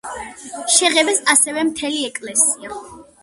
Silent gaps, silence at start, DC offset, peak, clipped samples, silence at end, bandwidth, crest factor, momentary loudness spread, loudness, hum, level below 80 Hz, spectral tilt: none; 0.05 s; under 0.1%; 0 dBFS; under 0.1%; 0.2 s; 16 kHz; 20 dB; 18 LU; -15 LUFS; none; -58 dBFS; 0.5 dB/octave